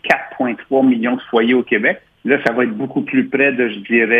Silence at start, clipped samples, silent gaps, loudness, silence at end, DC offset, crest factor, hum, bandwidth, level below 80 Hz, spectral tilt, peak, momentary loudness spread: 0.05 s; under 0.1%; none; -16 LUFS; 0 s; under 0.1%; 16 dB; none; 6.8 kHz; -62 dBFS; -6.5 dB/octave; 0 dBFS; 6 LU